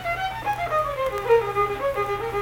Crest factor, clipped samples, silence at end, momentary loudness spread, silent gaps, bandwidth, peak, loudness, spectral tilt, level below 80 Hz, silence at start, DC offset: 16 dB; under 0.1%; 0 s; 6 LU; none; 18 kHz; -8 dBFS; -24 LUFS; -5 dB/octave; -46 dBFS; 0 s; under 0.1%